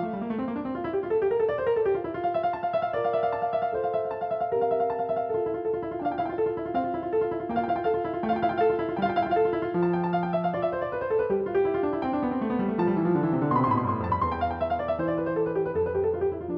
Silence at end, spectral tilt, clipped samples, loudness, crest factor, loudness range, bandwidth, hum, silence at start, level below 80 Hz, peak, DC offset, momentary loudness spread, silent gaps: 0 s; -10 dB/octave; under 0.1%; -27 LUFS; 14 dB; 2 LU; 5.4 kHz; none; 0 s; -54 dBFS; -12 dBFS; under 0.1%; 5 LU; none